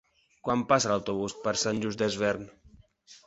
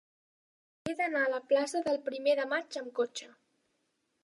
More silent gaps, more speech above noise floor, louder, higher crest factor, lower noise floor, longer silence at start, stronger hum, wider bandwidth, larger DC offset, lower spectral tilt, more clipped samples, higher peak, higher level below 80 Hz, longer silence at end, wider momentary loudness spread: neither; second, 28 dB vs 47 dB; first, -28 LUFS vs -32 LUFS; about the same, 22 dB vs 18 dB; second, -56 dBFS vs -79 dBFS; second, 0.45 s vs 0.85 s; neither; second, 8.2 kHz vs 11.5 kHz; neither; about the same, -4 dB/octave vs -3 dB/octave; neither; first, -8 dBFS vs -16 dBFS; first, -60 dBFS vs -78 dBFS; second, 0.1 s vs 0.95 s; about the same, 11 LU vs 10 LU